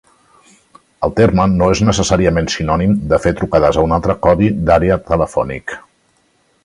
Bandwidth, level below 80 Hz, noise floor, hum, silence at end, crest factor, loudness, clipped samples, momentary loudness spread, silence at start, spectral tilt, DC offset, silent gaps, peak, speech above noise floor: 11.5 kHz; -30 dBFS; -58 dBFS; none; 0.85 s; 14 dB; -14 LUFS; under 0.1%; 7 LU; 1 s; -6 dB/octave; under 0.1%; none; 0 dBFS; 45 dB